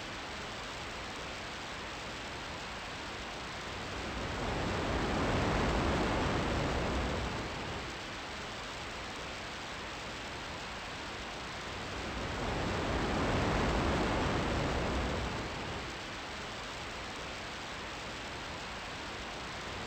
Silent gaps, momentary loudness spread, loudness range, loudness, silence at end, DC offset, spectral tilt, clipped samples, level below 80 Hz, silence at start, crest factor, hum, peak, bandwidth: none; 9 LU; 7 LU; -37 LUFS; 0 s; under 0.1%; -4.5 dB/octave; under 0.1%; -46 dBFS; 0 s; 16 dB; none; -20 dBFS; 16.5 kHz